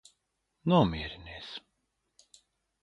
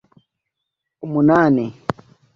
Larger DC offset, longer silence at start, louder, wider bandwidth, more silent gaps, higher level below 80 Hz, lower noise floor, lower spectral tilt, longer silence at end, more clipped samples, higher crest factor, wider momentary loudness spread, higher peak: neither; second, 0.65 s vs 1.05 s; second, -29 LUFS vs -18 LUFS; first, 9.8 kHz vs 7 kHz; neither; about the same, -52 dBFS vs -54 dBFS; about the same, -80 dBFS vs -80 dBFS; second, -7.5 dB/octave vs -9 dB/octave; first, 1.25 s vs 0.45 s; neither; about the same, 24 dB vs 20 dB; about the same, 18 LU vs 20 LU; second, -10 dBFS vs 0 dBFS